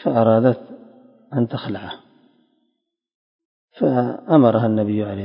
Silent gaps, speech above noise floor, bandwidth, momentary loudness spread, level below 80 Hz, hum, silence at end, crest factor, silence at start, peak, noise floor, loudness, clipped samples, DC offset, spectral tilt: 3.15-3.39 s, 3.45-3.68 s; 56 dB; 5.4 kHz; 15 LU; -58 dBFS; none; 0 s; 20 dB; 0 s; 0 dBFS; -74 dBFS; -19 LUFS; under 0.1%; under 0.1%; -12 dB/octave